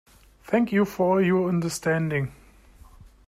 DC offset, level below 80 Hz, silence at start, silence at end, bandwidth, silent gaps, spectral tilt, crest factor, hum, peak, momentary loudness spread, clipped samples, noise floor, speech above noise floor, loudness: under 0.1%; -54 dBFS; 0.5 s; 0.2 s; 15.5 kHz; none; -6.5 dB/octave; 16 dB; none; -10 dBFS; 6 LU; under 0.1%; -51 dBFS; 28 dB; -24 LUFS